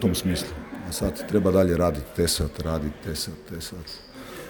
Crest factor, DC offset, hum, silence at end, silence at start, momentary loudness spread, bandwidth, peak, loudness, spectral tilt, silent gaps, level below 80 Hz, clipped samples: 20 dB; under 0.1%; none; 0 s; 0 s; 16 LU; over 20 kHz; -6 dBFS; -26 LUFS; -5 dB/octave; none; -40 dBFS; under 0.1%